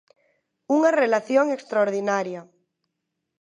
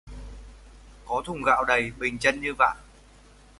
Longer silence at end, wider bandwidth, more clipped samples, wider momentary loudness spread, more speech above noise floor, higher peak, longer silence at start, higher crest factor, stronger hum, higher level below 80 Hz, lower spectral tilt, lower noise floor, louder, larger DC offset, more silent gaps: first, 1 s vs 0.75 s; about the same, 10.5 kHz vs 11.5 kHz; neither; second, 8 LU vs 22 LU; first, 59 dB vs 28 dB; about the same, -6 dBFS vs -6 dBFS; first, 0.7 s vs 0.05 s; about the same, 18 dB vs 22 dB; neither; second, -82 dBFS vs -46 dBFS; about the same, -5 dB/octave vs -4 dB/octave; first, -80 dBFS vs -53 dBFS; about the same, -22 LUFS vs -24 LUFS; neither; neither